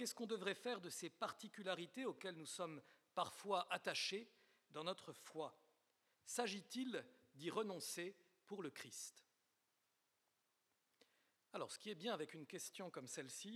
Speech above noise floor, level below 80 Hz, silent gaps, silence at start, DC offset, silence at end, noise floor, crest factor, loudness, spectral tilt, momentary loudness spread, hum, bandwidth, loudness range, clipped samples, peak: 38 dB; under -90 dBFS; none; 0 s; under 0.1%; 0 s; -86 dBFS; 24 dB; -48 LUFS; -3 dB/octave; 10 LU; none; 16.5 kHz; 9 LU; under 0.1%; -26 dBFS